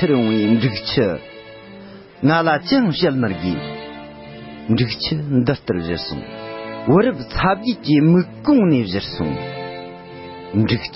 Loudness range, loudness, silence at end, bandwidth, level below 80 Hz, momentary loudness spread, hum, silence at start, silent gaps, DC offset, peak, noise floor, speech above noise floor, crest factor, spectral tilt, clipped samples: 4 LU; -18 LUFS; 0 s; 5.8 kHz; -42 dBFS; 20 LU; none; 0 s; none; under 0.1%; -2 dBFS; -39 dBFS; 22 dB; 16 dB; -10.5 dB/octave; under 0.1%